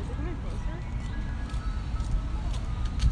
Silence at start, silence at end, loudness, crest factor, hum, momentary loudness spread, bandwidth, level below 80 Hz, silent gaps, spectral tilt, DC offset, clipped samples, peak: 0 s; 0 s; -34 LUFS; 16 dB; none; 3 LU; 10 kHz; -30 dBFS; none; -6.5 dB/octave; under 0.1%; under 0.1%; -12 dBFS